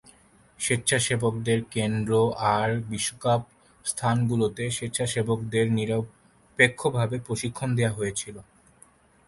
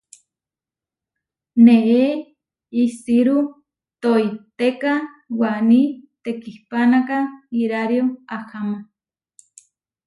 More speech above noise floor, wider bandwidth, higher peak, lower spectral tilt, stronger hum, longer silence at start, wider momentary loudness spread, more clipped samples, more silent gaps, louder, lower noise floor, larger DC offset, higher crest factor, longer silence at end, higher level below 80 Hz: second, 32 dB vs 72 dB; about the same, 11.5 kHz vs 11 kHz; about the same, -4 dBFS vs -2 dBFS; second, -4.5 dB/octave vs -6.5 dB/octave; neither; second, 0.6 s vs 1.55 s; second, 8 LU vs 15 LU; neither; neither; second, -26 LUFS vs -19 LUFS; second, -57 dBFS vs -89 dBFS; neither; about the same, 22 dB vs 18 dB; second, 0.85 s vs 1.25 s; first, -56 dBFS vs -68 dBFS